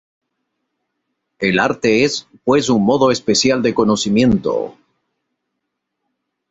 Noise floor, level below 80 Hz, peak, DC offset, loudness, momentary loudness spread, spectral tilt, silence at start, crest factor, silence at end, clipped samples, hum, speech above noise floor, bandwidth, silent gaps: -76 dBFS; -48 dBFS; -2 dBFS; under 0.1%; -15 LUFS; 7 LU; -4.5 dB/octave; 1.4 s; 16 dB; 1.8 s; under 0.1%; none; 61 dB; 8.2 kHz; none